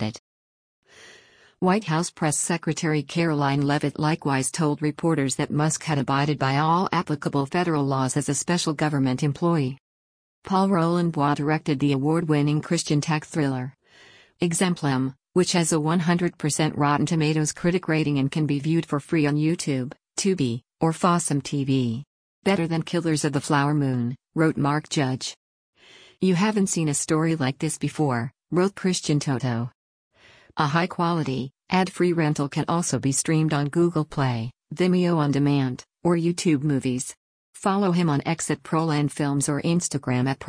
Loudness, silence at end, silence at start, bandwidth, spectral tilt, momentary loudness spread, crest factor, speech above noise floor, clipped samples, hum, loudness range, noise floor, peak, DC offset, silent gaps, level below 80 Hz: -24 LUFS; 0 s; 0 s; 10.5 kHz; -5.5 dB/octave; 5 LU; 16 dB; 31 dB; under 0.1%; none; 2 LU; -54 dBFS; -8 dBFS; under 0.1%; 0.19-0.83 s, 9.80-10.42 s, 22.07-22.42 s, 25.37-25.73 s, 29.75-30.11 s, 37.17-37.53 s; -60 dBFS